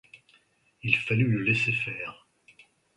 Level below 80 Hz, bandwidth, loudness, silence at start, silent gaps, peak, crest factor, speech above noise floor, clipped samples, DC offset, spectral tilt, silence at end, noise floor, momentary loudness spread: -64 dBFS; 11 kHz; -26 LUFS; 0.15 s; none; -6 dBFS; 24 dB; 38 dB; under 0.1%; under 0.1%; -6.5 dB/octave; 0.85 s; -65 dBFS; 13 LU